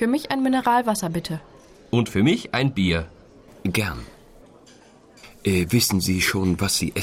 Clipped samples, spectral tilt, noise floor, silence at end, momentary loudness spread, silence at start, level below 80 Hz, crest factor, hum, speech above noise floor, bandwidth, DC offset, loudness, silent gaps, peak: under 0.1%; -4.5 dB/octave; -50 dBFS; 0 s; 10 LU; 0 s; -46 dBFS; 16 dB; none; 29 dB; 16.5 kHz; under 0.1%; -22 LUFS; none; -8 dBFS